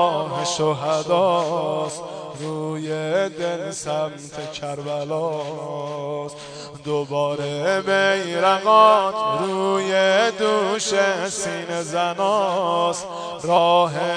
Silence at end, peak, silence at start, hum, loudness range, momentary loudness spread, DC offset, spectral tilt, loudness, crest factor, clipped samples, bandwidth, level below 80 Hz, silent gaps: 0 s; -2 dBFS; 0 s; none; 9 LU; 13 LU; under 0.1%; -4 dB/octave; -21 LUFS; 20 dB; under 0.1%; 10 kHz; -64 dBFS; none